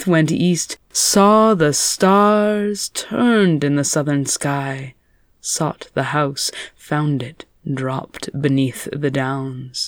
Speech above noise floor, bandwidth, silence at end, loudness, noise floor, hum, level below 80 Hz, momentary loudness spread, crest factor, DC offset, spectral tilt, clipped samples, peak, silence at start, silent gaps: 28 dB; over 20 kHz; 0 s; -18 LUFS; -46 dBFS; none; -54 dBFS; 14 LU; 16 dB; under 0.1%; -4.5 dB/octave; under 0.1%; -2 dBFS; 0 s; none